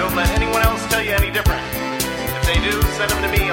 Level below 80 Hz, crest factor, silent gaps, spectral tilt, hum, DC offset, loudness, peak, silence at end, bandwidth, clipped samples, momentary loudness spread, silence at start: -24 dBFS; 16 dB; none; -4 dB/octave; none; under 0.1%; -18 LUFS; -2 dBFS; 0 s; 17 kHz; under 0.1%; 4 LU; 0 s